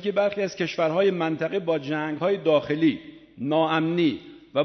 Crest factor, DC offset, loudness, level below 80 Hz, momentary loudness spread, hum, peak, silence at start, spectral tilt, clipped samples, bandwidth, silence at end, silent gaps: 16 dB; under 0.1%; -24 LUFS; -66 dBFS; 6 LU; none; -8 dBFS; 0 s; -6.5 dB/octave; under 0.1%; 6.4 kHz; 0 s; none